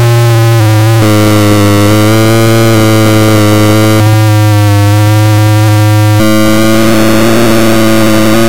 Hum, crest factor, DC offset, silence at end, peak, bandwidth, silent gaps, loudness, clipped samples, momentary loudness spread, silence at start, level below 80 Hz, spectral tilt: none; 6 dB; 10%; 0 s; 0 dBFS; 17 kHz; none; -6 LUFS; under 0.1%; 1 LU; 0 s; -32 dBFS; -6 dB/octave